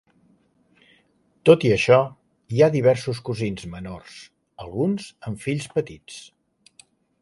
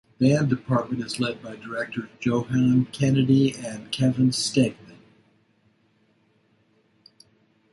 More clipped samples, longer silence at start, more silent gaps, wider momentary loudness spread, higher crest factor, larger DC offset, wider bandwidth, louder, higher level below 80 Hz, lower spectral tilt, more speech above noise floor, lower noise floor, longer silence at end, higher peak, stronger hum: neither; first, 1.45 s vs 0.2 s; neither; first, 23 LU vs 11 LU; about the same, 22 dB vs 18 dB; neither; about the same, 11.5 kHz vs 11.5 kHz; about the same, -21 LUFS vs -23 LUFS; first, -54 dBFS vs -60 dBFS; about the same, -6.5 dB/octave vs -6 dB/octave; about the same, 42 dB vs 42 dB; about the same, -63 dBFS vs -64 dBFS; second, 1 s vs 3 s; first, -2 dBFS vs -8 dBFS; neither